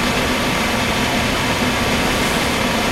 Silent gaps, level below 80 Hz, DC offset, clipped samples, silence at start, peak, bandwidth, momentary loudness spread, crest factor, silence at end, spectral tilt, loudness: none; -32 dBFS; under 0.1%; under 0.1%; 0 s; -4 dBFS; 16 kHz; 1 LU; 14 dB; 0 s; -3.5 dB/octave; -17 LUFS